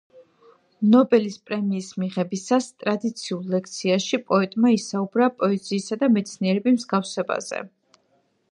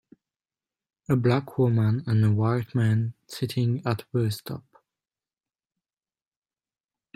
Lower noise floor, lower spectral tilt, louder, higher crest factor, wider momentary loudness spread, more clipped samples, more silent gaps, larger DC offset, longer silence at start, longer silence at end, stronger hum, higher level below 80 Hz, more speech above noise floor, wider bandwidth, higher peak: second, -66 dBFS vs under -90 dBFS; second, -5.5 dB/octave vs -8 dB/octave; about the same, -23 LUFS vs -25 LUFS; about the same, 18 dB vs 18 dB; about the same, 9 LU vs 11 LU; neither; neither; neither; second, 0.15 s vs 1.1 s; second, 0.85 s vs 2.55 s; neither; second, -74 dBFS vs -62 dBFS; second, 44 dB vs over 66 dB; second, 11 kHz vs 14 kHz; first, -6 dBFS vs -10 dBFS